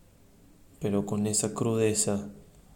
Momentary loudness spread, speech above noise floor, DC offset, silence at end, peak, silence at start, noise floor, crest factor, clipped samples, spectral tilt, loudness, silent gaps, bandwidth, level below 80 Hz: 10 LU; 29 dB; under 0.1%; 0.3 s; -12 dBFS; 0.8 s; -57 dBFS; 18 dB; under 0.1%; -4.5 dB/octave; -28 LUFS; none; 17 kHz; -60 dBFS